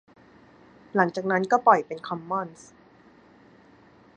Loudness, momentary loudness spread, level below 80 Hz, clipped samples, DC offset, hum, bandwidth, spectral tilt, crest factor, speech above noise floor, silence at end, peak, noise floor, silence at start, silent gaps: -24 LUFS; 14 LU; -72 dBFS; under 0.1%; under 0.1%; none; 9.4 kHz; -6 dB/octave; 24 dB; 31 dB; 1.65 s; -4 dBFS; -55 dBFS; 0.95 s; none